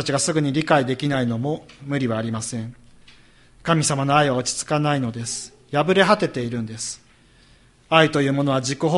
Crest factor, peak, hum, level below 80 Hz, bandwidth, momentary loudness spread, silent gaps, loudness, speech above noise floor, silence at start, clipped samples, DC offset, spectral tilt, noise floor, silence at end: 22 dB; 0 dBFS; none; -54 dBFS; 11.5 kHz; 13 LU; none; -21 LUFS; 33 dB; 0 s; under 0.1%; under 0.1%; -4.5 dB/octave; -53 dBFS; 0 s